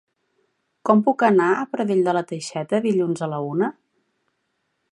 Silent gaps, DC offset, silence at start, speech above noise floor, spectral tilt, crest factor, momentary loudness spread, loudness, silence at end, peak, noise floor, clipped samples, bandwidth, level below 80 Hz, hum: none; under 0.1%; 0.85 s; 53 dB; -6.5 dB/octave; 20 dB; 9 LU; -21 LUFS; 1.2 s; -2 dBFS; -73 dBFS; under 0.1%; 11 kHz; -74 dBFS; none